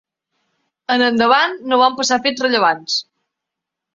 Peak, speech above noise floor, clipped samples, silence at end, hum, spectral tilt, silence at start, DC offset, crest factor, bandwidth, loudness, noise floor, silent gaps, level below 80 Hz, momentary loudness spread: 0 dBFS; 67 dB; under 0.1%; 0.95 s; none; -2 dB/octave; 0.9 s; under 0.1%; 18 dB; 7.8 kHz; -16 LUFS; -82 dBFS; none; -64 dBFS; 8 LU